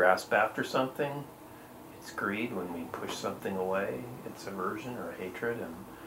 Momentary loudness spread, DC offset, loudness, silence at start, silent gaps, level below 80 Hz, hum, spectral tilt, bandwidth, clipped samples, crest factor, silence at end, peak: 16 LU; under 0.1%; -34 LUFS; 0 s; none; -66 dBFS; none; -5 dB/octave; 16 kHz; under 0.1%; 24 dB; 0 s; -10 dBFS